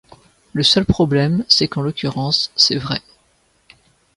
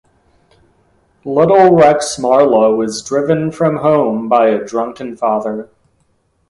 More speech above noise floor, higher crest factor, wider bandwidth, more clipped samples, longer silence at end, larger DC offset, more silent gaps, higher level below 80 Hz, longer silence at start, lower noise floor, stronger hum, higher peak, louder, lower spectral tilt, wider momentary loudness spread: second, 43 dB vs 48 dB; first, 20 dB vs 14 dB; about the same, 11.5 kHz vs 11.5 kHz; neither; first, 1.2 s vs 0.85 s; neither; neither; first, -42 dBFS vs -52 dBFS; second, 0.55 s vs 1.25 s; about the same, -60 dBFS vs -60 dBFS; neither; about the same, 0 dBFS vs 0 dBFS; second, -16 LUFS vs -13 LUFS; second, -4.5 dB/octave vs -6 dB/octave; second, 9 LU vs 12 LU